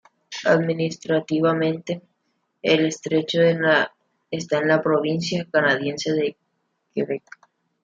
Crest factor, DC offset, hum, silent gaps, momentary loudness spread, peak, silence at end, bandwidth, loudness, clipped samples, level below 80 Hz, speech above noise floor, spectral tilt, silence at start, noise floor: 18 dB; under 0.1%; none; none; 12 LU; -4 dBFS; 0.65 s; 7.8 kHz; -22 LUFS; under 0.1%; -68 dBFS; 51 dB; -5.5 dB/octave; 0.3 s; -72 dBFS